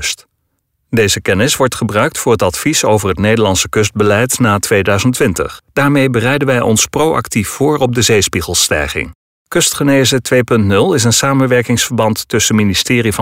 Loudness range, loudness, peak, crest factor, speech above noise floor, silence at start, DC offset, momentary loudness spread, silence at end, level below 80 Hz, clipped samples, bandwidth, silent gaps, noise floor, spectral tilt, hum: 1 LU; -12 LUFS; -2 dBFS; 12 dB; 54 dB; 0 s; under 0.1%; 4 LU; 0 s; -38 dBFS; under 0.1%; 16.5 kHz; 9.15-9.45 s; -66 dBFS; -4 dB/octave; none